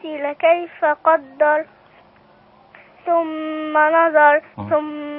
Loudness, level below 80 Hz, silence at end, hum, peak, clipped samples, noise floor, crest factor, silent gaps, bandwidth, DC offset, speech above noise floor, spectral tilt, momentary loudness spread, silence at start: -17 LUFS; -64 dBFS; 0 s; none; -2 dBFS; under 0.1%; -51 dBFS; 16 dB; none; 4 kHz; under 0.1%; 33 dB; -9.5 dB/octave; 11 LU; 0.05 s